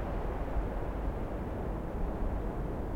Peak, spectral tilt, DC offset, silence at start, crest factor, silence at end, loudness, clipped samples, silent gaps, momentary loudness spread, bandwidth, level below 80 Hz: -22 dBFS; -9 dB/octave; under 0.1%; 0 s; 12 dB; 0 s; -37 LUFS; under 0.1%; none; 1 LU; 6.6 kHz; -36 dBFS